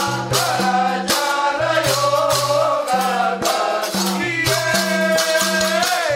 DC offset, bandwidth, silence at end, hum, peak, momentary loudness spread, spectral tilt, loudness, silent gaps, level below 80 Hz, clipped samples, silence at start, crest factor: under 0.1%; 16.5 kHz; 0 s; none; -4 dBFS; 3 LU; -3 dB/octave; -17 LUFS; none; -52 dBFS; under 0.1%; 0 s; 14 dB